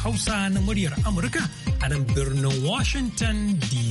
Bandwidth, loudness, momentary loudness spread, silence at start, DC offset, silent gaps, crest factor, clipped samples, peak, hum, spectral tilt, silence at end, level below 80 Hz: 11.5 kHz; -24 LUFS; 2 LU; 0 s; under 0.1%; none; 10 dB; under 0.1%; -12 dBFS; none; -5 dB/octave; 0 s; -32 dBFS